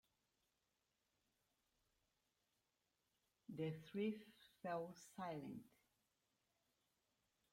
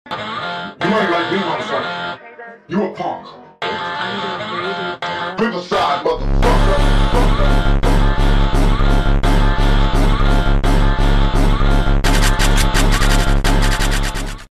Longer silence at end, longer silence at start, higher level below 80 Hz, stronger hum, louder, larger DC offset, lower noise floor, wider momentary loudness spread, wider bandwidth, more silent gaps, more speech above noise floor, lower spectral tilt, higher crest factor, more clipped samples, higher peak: first, 1.85 s vs 0.05 s; first, 3.5 s vs 0.05 s; second, -90 dBFS vs -16 dBFS; neither; second, -50 LUFS vs -17 LUFS; neither; first, -89 dBFS vs -36 dBFS; first, 12 LU vs 8 LU; first, 16 kHz vs 13.5 kHz; neither; first, 40 dB vs 16 dB; first, -6.5 dB/octave vs -5 dB/octave; first, 20 dB vs 10 dB; neither; second, -36 dBFS vs -4 dBFS